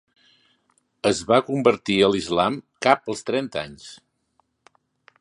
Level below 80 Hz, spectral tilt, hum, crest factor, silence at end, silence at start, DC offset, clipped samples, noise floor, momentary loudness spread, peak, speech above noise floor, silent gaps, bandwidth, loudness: -58 dBFS; -4.5 dB/octave; none; 22 dB; 1.25 s; 1.05 s; under 0.1%; under 0.1%; -69 dBFS; 12 LU; 0 dBFS; 47 dB; none; 11.5 kHz; -22 LUFS